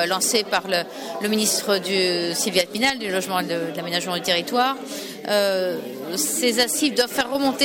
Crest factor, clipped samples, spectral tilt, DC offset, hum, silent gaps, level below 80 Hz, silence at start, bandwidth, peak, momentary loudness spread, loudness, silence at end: 16 dB; under 0.1%; -2 dB/octave; under 0.1%; none; none; -62 dBFS; 0 s; 17.5 kHz; -6 dBFS; 8 LU; -22 LUFS; 0 s